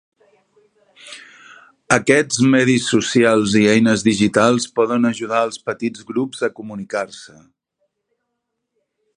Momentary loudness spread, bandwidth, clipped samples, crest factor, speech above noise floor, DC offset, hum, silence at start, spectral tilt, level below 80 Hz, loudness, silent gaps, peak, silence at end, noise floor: 17 LU; 11 kHz; under 0.1%; 18 dB; 59 dB; under 0.1%; none; 1.05 s; -4.5 dB/octave; -56 dBFS; -17 LUFS; none; 0 dBFS; 1.9 s; -76 dBFS